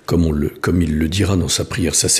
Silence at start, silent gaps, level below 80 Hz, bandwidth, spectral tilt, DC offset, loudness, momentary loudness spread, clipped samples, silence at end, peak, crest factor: 0.1 s; none; -30 dBFS; 15.5 kHz; -4 dB/octave; under 0.1%; -18 LUFS; 3 LU; under 0.1%; 0 s; -2 dBFS; 14 dB